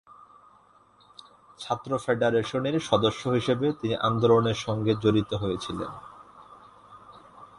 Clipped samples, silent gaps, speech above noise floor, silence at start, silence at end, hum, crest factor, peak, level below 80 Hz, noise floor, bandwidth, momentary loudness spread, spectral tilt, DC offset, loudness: under 0.1%; none; 33 dB; 1.6 s; 0.1 s; none; 20 dB; -6 dBFS; -56 dBFS; -59 dBFS; 11.5 kHz; 12 LU; -6 dB/octave; under 0.1%; -26 LUFS